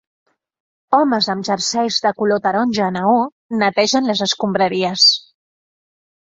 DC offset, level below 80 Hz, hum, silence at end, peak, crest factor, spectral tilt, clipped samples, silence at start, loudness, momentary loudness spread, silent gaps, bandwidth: under 0.1%; -62 dBFS; none; 1 s; -2 dBFS; 16 dB; -3.5 dB/octave; under 0.1%; 0.9 s; -16 LUFS; 7 LU; 3.32-3.49 s; 8 kHz